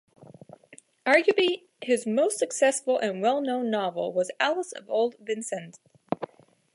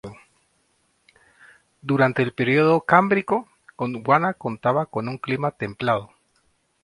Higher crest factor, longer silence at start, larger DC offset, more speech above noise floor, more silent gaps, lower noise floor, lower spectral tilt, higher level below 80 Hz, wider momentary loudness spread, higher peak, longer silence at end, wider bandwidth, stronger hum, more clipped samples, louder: about the same, 20 dB vs 22 dB; first, 0.7 s vs 0.05 s; neither; second, 30 dB vs 46 dB; neither; second, -55 dBFS vs -67 dBFS; second, -3 dB/octave vs -8 dB/octave; second, -80 dBFS vs -62 dBFS; about the same, 12 LU vs 11 LU; second, -6 dBFS vs 0 dBFS; second, 0.5 s vs 0.75 s; about the same, 11.5 kHz vs 11.5 kHz; neither; neither; second, -26 LUFS vs -22 LUFS